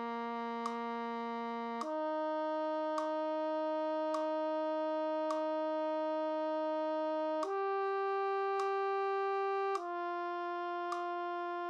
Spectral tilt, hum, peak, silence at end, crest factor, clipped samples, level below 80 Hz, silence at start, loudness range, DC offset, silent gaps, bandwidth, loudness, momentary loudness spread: -4 dB/octave; none; -22 dBFS; 0 s; 14 dB; under 0.1%; under -90 dBFS; 0 s; 2 LU; under 0.1%; none; 9.6 kHz; -36 LUFS; 5 LU